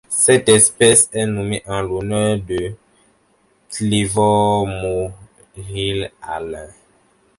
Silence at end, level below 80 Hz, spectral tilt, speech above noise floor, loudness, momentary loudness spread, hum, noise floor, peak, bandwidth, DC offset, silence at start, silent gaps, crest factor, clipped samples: 0.65 s; -44 dBFS; -3.5 dB/octave; 42 dB; -16 LUFS; 18 LU; none; -59 dBFS; 0 dBFS; 12 kHz; under 0.1%; 0.1 s; none; 18 dB; under 0.1%